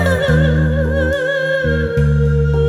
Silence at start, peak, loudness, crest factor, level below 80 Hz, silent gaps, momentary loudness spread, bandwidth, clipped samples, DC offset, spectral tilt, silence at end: 0 s; -4 dBFS; -15 LUFS; 10 dB; -22 dBFS; none; 3 LU; 12.5 kHz; under 0.1%; under 0.1%; -7.5 dB/octave; 0 s